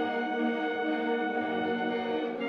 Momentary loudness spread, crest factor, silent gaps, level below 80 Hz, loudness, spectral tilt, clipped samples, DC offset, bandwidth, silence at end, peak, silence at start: 1 LU; 12 dB; none; -78 dBFS; -30 LUFS; -6.5 dB/octave; under 0.1%; under 0.1%; 6.4 kHz; 0 s; -18 dBFS; 0 s